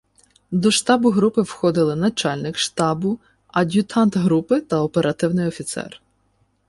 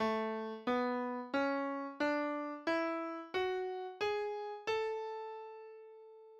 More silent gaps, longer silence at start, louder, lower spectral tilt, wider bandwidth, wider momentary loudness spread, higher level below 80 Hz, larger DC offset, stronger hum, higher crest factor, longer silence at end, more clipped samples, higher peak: neither; first, 0.5 s vs 0 s; first, -20 LUFS vs -38 LUFS; about the same, -5 dB/octave vs -5 dB/octave; about the same, 11.5 kHz vs 12 kHz; second, 9 LU vs 14 LU; first, -56 dBFS vs -76 dBFS; neither; neither; about the same, 16 dB vs 14 dB; first, 0.8 s vs 0 s; neither; first, -4 dBFS vs -24 dBFS